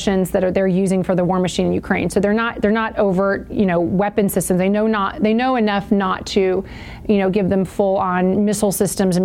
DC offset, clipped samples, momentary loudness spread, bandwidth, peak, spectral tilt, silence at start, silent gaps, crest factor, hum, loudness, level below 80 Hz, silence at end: 0.1%; under 0.1%; 2 LU; 17 kHz; -2 dBFS; -6 dB/octave; 0 s; none; 14 dB; none; -18 LUFS; -42 dBFS; 0 s